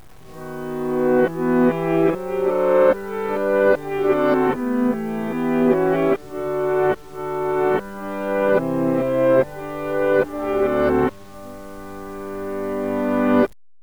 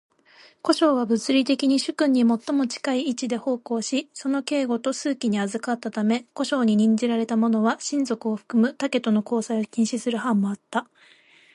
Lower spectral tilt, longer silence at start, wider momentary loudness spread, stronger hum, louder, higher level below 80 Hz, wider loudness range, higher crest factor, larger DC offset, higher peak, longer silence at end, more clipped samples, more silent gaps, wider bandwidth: first, -7.5 dB/octave vs -5 dB/octave; second, 0.3 s vs 0.65 s; first, 13 LU vs 7 LU; neither; first, -20 LUFS vs -23 LUFS; first, -48 dBFS vs -74 dBFS; about the same, 4 LU vs 3 LU; about the same, 16 dB vs 16 dB; first, 0.8% vs under 0.1%; about the same, -4 dBFS vs -6 dBFS; second, 0.35 s vs 0.7 s; neither; neither; first, over 20 kHz vs 11.5 kHz